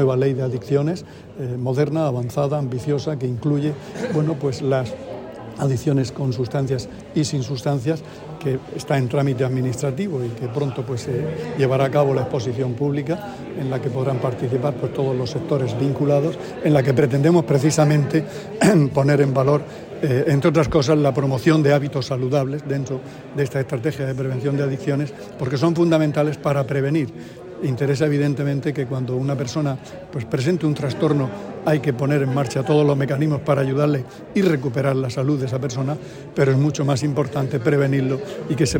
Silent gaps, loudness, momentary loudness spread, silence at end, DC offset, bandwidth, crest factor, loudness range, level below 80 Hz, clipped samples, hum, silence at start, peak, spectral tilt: none; -21 LUFS; 9 LU; 0 s; under 0.1%; 16.5 kHz; 16 dB; 5 LU; -50 dBFS; under 0.1%; none; 0 s; -4 dBFS; -7 dB/octave